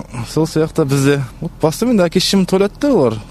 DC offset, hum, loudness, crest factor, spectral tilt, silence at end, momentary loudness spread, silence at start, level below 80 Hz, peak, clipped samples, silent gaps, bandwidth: under 0.1%; none; -15 LUFS; 14 dB; -5.5 dB/octave; 0 s; 6 LU; 0 s; -40 dBFS; 0 dBFS; under 0.1%; none; 13.5 kHz